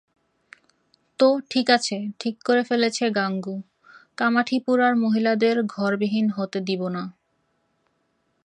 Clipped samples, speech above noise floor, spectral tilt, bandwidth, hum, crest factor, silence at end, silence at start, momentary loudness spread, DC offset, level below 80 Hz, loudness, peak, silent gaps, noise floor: under 0.1%; 48 dB; -5 dB/octave; 10 kHz; none; 20 dB; 1.35 s; 1.2 s; 10 LU; under 0.1%; -76 dBFS; -22 LUFS; -4 dBFS; none; -70 dBFS